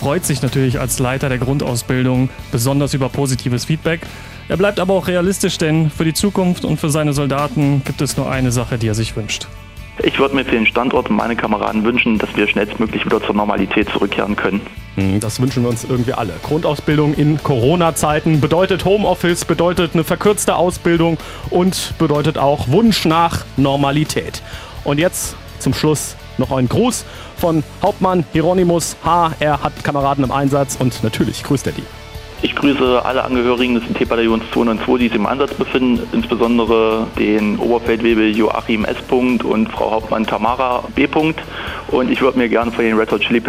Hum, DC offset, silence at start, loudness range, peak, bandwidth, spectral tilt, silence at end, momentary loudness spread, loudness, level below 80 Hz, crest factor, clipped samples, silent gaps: none; under 0.1%; 0 s; 3 LU; 0 dBFS; 16 kHz; -5.5 dB/octave; 0 s; 6 LU; -16 LUFS; -36 dBFS; 14 dB; under 0.1%; none